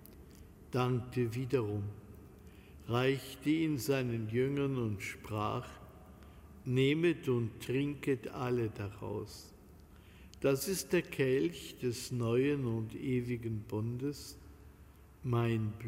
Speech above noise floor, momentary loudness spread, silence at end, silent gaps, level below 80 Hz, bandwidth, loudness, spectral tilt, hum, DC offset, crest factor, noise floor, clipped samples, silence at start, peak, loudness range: 23 dB; 22 LU; 0 s; none; -60 dBFS; 16 kHz; -35 LUFS; -6 dB/octave; none; under 0.1%; 18 dB; -57 dBFS; under 0.1%; 0 s; -18 dBFS; 3 LU